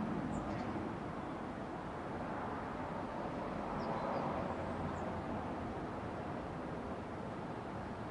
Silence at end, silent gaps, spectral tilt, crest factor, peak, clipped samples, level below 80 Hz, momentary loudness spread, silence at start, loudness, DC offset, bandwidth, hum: 0 s; none; -7.5 dB/octave; 16 dB; -26 dBFS; under 0.1%; -58 dBFS; 5 LU; 0 s; -42 LUFS; under 0.1%; 11 kHz; none